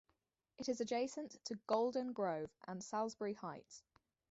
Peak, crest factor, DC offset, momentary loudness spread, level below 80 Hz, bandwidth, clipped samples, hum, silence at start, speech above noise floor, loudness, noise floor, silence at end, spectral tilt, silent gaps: -22 dBFS; 20 dB; under 0.1%; 12 LU; -82 dBFS; 8 kHz; under 0.1%; none; 0.6 s; 42 dB; -42 LUFS; -84 dBFS; 0.5 s; -4.5 dB/octave; none